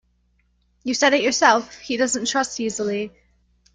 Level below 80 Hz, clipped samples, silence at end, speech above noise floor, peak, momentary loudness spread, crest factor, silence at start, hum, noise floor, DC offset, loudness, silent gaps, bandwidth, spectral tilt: -60 dBFS; under 0.1%; 0.65 s; 44 dB; -2 dBFS; 12 LU; 20 dB; 0.85 s; 60 Hz at -50 dBFS; -64 dBFS; under 0.1%; -20 LUFS; none; 10 kHz; -2 dB/octave